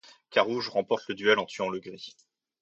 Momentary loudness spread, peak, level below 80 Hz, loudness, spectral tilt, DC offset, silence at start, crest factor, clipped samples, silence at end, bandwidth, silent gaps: 18 LU; -6 dBFS; -74 dBFS; -28 LUFS; -4 dB/octave; under 0.1%; 0.3 s; 24 dB; under 0.1%; 0.5 s; 8 kHz; none